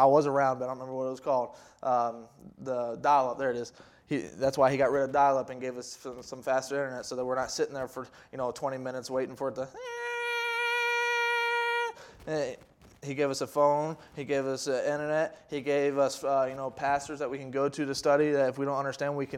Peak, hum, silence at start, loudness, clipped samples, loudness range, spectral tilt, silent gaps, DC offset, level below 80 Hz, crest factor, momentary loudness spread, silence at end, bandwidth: -10 dBFS; none; 0 s; -30 LUFS; under 0.1%; 5 LU; -4.5 dB/octave; none; under 0.1%; -68 dBFS; 20 dB; 12 LU; 0 s; 15.5 kHz